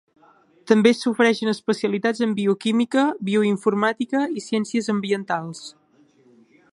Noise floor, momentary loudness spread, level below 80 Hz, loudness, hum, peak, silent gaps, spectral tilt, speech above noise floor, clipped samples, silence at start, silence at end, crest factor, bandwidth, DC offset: -57 dBFS; 7 LU; -72 dBFS; -21 LUFS; none; -4 dBFS; none; -5.5 dB/octave; 36 dB; under 0.1%; 0.65 s; 1 s; 18 dB; 11.5 kHz; under 0.1%